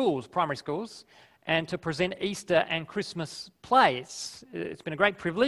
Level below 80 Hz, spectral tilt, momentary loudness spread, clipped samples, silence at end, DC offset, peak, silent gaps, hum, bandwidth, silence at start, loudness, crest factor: -64 dBFS; -4.5 dB/octave; 14 LU; under 0.1%; 0 s; under 0.1%; -6 dBFS; none; none; 12.5 kHz; 0 s; -28 LUFS; 22 dB